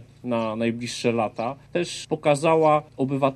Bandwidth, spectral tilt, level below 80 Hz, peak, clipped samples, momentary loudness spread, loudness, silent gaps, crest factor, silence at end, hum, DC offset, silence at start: 12.5 kHz; -5.5 dB/octave; -62 dBFS; -6 dBFS; under 0.1%; 9 LU; -24 LUFS; none; 18 dB; 0 s; none; under 0.1%; 0 s